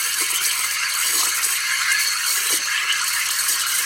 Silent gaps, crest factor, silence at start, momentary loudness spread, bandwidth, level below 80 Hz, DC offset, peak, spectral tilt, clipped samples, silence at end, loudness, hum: none; 16 dB; 0 s; 2 LU; 16.5 kHz; -64 dBFS; under 0.1%; -4 dBFS; 3.5 dB/octave; under 0.1%; 0 s; -18 LUFS; none